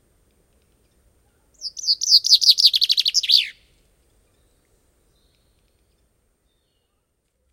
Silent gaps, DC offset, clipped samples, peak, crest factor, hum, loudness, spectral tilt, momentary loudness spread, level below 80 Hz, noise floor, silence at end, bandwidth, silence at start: none; under 0.1%; under 0.1%; -2 dBFS; 22 dB; none; -14 LUFS; 4.5 dB/octave; 18 LU; -64 dBFS; -71 dBFS; 4 s; 16.5 kHz; 1.6 s